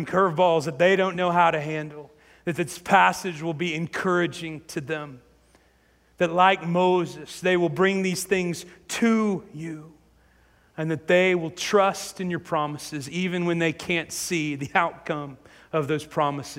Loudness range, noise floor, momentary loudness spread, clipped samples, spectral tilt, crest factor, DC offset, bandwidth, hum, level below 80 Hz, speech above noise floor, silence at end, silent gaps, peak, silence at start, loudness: 4 LU; -61 dBFS; 13 LU; under 0.1%; -5 dB/octave; 20 dB; under 0.1%; 16 kHz; none; -62 dBFS; 37 dB; 0 s; none; -4 dBFS; 0 s; -24 LUFS